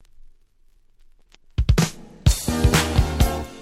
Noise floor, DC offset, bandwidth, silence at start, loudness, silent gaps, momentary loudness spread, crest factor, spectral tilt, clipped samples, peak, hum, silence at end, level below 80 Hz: -55 dBFS; under 0.1%; 16.5 kHz; 1.6 s; -21 LUFS; none; 7 LU; 18 dB; -5 dB/octave; under 0.1%; -4 dBFS; none; 0 s; -26 dBFS